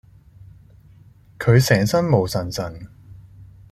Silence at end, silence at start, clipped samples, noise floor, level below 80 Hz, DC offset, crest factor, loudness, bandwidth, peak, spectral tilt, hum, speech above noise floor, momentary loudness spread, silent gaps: 0.3 s; 1.4 s; under 0.1%; -49 dBFS; -48 dBFS; under 0.1%; 20 dB; -19 LUFS; 15.5 kHz; -2 dBFS; -6 dB/octave; none; 31 dB; 19 LU; none